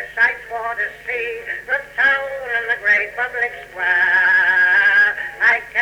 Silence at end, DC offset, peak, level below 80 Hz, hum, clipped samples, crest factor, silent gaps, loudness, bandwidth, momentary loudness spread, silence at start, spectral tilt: 0 s; under 0.1%; -6 dBFS; -54 dBFS; none; under 0.1%; 12 dB; none; -16 LUFS; 16 kHz; 11 LU; 0 s; -2 dB/octave